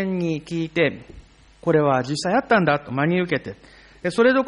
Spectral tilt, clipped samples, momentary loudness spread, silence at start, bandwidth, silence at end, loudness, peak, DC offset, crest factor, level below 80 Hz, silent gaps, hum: -6 dB/octave; under 0.1%; 9 LU; 0 s; 10.5 kHz; 0 s; -21 LUFS; -6 dBFS; under 0.1%; 16 dB; -54 dBFS; none; none